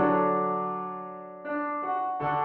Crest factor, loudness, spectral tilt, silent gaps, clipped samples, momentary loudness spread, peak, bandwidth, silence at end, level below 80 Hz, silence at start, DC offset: 16 dB; -29 LUFS; -6 dB/octave; none; under 0.1%; 14 LU; -12 dBFS; 4.5 kHz; 0 s; -68 dBFS; 0 s; under 0.1%